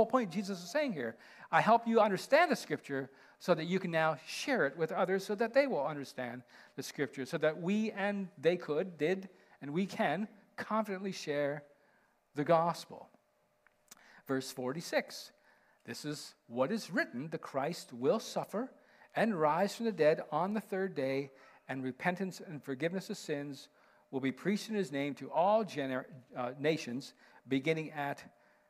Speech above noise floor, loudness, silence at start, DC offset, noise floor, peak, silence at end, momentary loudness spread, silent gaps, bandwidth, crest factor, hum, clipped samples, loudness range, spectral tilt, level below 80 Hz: 40 dB; -35 LUFS; 0 s; under 0.1%; -74 dBFS; -14 dBFS; 0.4 s; 14 LU; none; 15 kHz; 20 dB; none; under 0.1%; 7 LU; -5.5 dB/octave; -84 dBFS